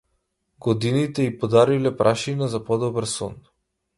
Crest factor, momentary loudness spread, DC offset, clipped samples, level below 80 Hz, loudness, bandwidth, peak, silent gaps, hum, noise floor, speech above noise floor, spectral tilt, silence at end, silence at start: 20 dB; 10 LU; under 0.1%; under 0.1%; -56 dBFS; -22 LUFS; 11.5 kHz; -4 dBFS; none; none; -73 dBFS; 51 dB; -6 dB/octave; 0.6 s; 0.65 s